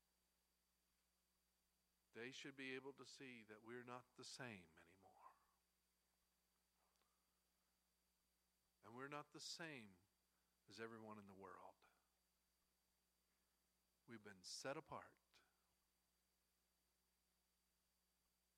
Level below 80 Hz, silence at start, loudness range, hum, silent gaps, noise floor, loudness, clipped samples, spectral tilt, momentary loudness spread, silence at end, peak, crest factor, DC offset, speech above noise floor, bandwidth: under -90 dBFS; 2.15 s; 7 LU; none; none; -88 dBFS; -58 LUFS; under 0.1%; -3 dB/octave; 12 LU; 3.15 s; -38 dBFS; 26 dB; under 0.1%; 30 dB; 14 kHz